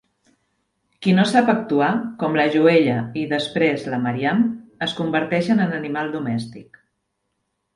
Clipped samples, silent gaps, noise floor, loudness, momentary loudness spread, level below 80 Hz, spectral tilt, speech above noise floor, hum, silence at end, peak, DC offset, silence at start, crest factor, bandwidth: under 0.1%; none; -74 dBFS; -20 LUFS; 10 LU; -62 dBFS; -6.5 dB/octave; 55 dB; none; 1.15 s; -2 dBFS; under 0.1%; 1 s; 20 dB; 11.5 kHz